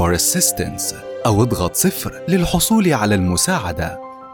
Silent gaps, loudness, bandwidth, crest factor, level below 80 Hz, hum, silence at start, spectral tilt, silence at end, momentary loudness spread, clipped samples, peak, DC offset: none; -17 LUFS; 19 kHz; 14 dB; -36 dBFS; none; 0 s; -4 dB/octave; 0 s; 9 LU; under 0.1%; -4 dBFS; under 0.1%